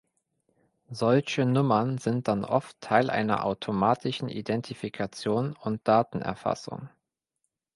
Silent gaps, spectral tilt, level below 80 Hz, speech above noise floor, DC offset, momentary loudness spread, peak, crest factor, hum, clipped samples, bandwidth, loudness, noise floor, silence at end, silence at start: none; -6.5 dB/octave; -62 dBFS; 55 dB; under 0.1%; 9 LU; -6 dBFS; 22 dB; none; under 0.1%; 11.5 kHz; -27 LUFS; -82 dBFS; 0.9 s; 0.9 s